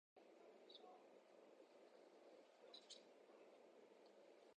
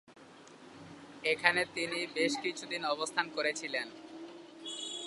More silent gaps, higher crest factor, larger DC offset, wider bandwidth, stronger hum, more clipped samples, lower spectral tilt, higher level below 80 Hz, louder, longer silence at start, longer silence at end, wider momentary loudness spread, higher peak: neither; second, 20 dB vs 28 dB; neither; second, 9 kHz vs 11.5 kHz; neither; neither; about the same, -2 dB/octave vs -2 dB/octave; second, under -90 dBFS vs -80 dBFS; second, -67 LUFS vs -33 LUFS; about the same, 0.15 s vs 0.1 s; about the same, 0.05 s vs 0 s; second, 5 LU vs 23 LU; second, -48 dBFS vs -8 dBFS